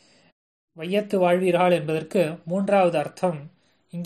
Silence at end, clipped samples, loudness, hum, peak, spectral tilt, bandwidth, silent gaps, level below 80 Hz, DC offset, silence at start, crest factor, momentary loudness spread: 0 s; under 0.1%; -23 LUFS; none; -8 dBFS; -6.5 dB/octave; 13 kHz; none; -70 dBFS; under 0.1%; 0.75 s; 16 dB; 9 LU